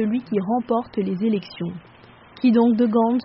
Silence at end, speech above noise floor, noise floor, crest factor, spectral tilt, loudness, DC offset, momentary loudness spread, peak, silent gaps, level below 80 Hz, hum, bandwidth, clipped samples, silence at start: 0 s; 27 dB; -47 dBFS; 14 dB; -7 dB/octave; -21 LUFS; under 0.1%; 14 LU; -6 dBFS; none; -60 dBFS; none; 5.8 kHz; under 0.1%; 0 s